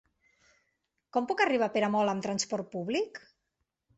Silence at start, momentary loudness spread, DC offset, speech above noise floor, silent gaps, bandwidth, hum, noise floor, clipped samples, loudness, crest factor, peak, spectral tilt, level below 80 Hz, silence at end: 1.15 s; 8 LU; under 0.1%; 53 dB; none; 8.2 kHz; none; -83 dBFS; under 0.1%; -30 LUFS; 20 dB; -12 dBFS; -4 dB/octave; -74 dBFS; 0.8 s